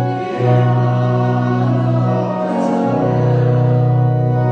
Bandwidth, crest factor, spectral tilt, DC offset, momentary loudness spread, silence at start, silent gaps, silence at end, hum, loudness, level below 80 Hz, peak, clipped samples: 6.2 kHz; 14 dB; -9.5 dB/octave; under 0.1%; 4 LU; 0 s; none; 0 s; none; -15 LUFS; -44 dBFS; -2 dBFS; under 0.1%